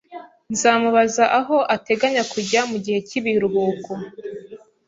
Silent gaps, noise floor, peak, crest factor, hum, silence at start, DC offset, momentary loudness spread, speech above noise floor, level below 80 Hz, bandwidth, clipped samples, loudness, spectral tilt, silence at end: none; -41 dBFS; -2 dBFS; 18 dB; none; 0.1 s; under 0.1%; 18 LU; 22 dB; -64 dBFS; 8 kHz; under 0.1%; -19 LUFS; -3.5 dB/octave; 0.3 s